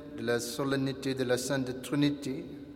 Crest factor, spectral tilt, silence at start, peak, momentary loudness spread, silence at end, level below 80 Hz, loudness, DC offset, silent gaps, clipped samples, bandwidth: 18 dB; -5 dB/octave; 0 s; -14 dBFS; 6 LU; 0 s; -62 dBFS; -32 LUFS; under 0.1%; none; under 0.1%; 16.5 kHz